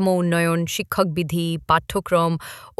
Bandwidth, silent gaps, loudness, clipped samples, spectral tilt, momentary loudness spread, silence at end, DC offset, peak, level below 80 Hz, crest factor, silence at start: 15 kHz; none; -21 LUFS; under 0.1%; -5.5 dB/octave; 4 LU; 0.1 s; under 0.1%; -4 dBFS; -48 dBFS; 16 dB; 0 s